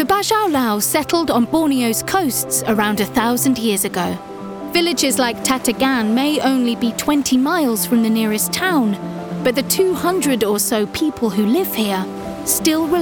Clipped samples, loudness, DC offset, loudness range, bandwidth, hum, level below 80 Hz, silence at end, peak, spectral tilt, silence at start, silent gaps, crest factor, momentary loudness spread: under 0.1%; -17 LUFS; under 0.1%; 1 LU; over 20 kHz; none; -50 dBFS; 0 s; -4 dBFS; -3.5 dB/octave; 0 s; none; 14 dB; 5 LU